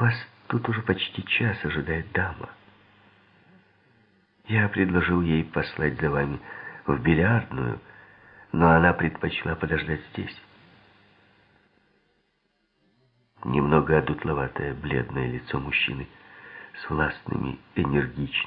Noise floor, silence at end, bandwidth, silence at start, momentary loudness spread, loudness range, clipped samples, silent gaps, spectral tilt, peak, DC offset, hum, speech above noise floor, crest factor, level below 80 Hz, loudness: -72 dBFS; 0 s; 5.2 kHz; 0 s; 15 LU; 8 LU; under 0.1%; none; -10.5 dB/octave; -4 dBFS; under 0.1%; none; 47 dB; 24 dB; -46 dBFS; -25 LUFS